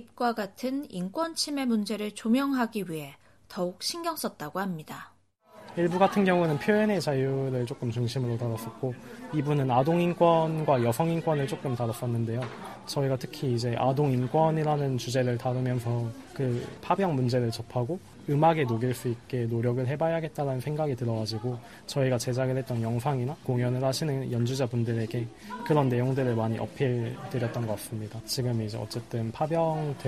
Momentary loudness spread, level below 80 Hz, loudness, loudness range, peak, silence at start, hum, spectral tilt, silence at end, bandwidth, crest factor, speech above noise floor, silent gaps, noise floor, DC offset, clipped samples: 10 LU; -62 dBFS; -29 LUFS; 4 LU; -8 dBFS; 0 s; none; -6.5 dB/octave; 0 s; 14.5 kHz; 20 dB; 27 dB; none; -55 dBFS; under 0.1%; under 0.1%